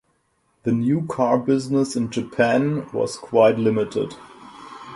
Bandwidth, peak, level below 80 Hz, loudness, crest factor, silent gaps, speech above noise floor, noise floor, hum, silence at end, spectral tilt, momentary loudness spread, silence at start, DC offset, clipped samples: 11.5 kHz; -2 dBFS; -60 dBFS; -21 LUFS; 18 dB; none; 46 dB; -67 dBFS; none; 0 s; -6.5 dB/octave; 14 LU; 0.65 s; under 0.1%; under 0.1%